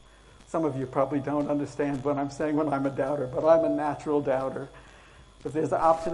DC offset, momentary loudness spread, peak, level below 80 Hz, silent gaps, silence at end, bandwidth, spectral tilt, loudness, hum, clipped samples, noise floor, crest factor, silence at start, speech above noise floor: under 0.1%; 11 LU; -8 dBFS; -56 dBFS; none; 0 s; 11 kHz; -7.5 dB/octave; -27 LUFS; none; under 0.1%; -53 dBFS; 20 dB; 0.5 s; 26 dB